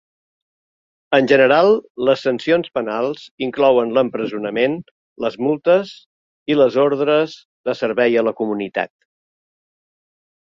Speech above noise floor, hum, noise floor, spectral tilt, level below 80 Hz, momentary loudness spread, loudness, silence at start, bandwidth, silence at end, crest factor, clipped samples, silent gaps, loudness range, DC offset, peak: over 73 dB; none; under -90 dBFS; -6.5 dB/octave; -64 dBFS; 12 LU; -18 LUFS; 1.1 s; 7.4 kHz; 1.55 s; 18 dB; under 0.1%; 1.90-1.95 s, 3.31-3.38 s, 4.91-5.16 s, 6.06-6.46 s, 7.45-7.64 s; 3 LU; under 0.1%; -2 dBFS